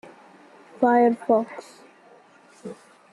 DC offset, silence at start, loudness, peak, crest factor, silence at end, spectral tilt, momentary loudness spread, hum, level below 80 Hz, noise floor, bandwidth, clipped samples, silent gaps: under 0.1%; 0.8 s; -21 LUFS; -6 dBFS; 20 dB; 0.4 s; -6.5 dB/octave; 23 LU; none; -74 dBFS; -53 dBFS; 11 kHz; under 0.1%; none